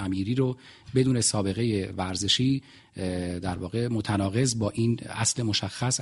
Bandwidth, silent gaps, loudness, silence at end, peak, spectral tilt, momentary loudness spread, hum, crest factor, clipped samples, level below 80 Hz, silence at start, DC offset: 11.5 kHz; none; -27 LUFS; 0 s; -8 dBFS; -4.5 dB/octave; 8 LU; none; 18 dB; under 0.1%; -54 dBFS; 0 s; under 0.1%